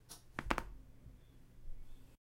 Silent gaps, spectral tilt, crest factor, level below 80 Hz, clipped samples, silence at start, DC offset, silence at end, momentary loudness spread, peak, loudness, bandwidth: none; -4.5 dB/octave; 34 dB; -52 dBFS; under 0.1%; 0 s; under 0.1%; 0.1 s; 22 LU; -12 dBFS; -43 LUFS; 16 kHz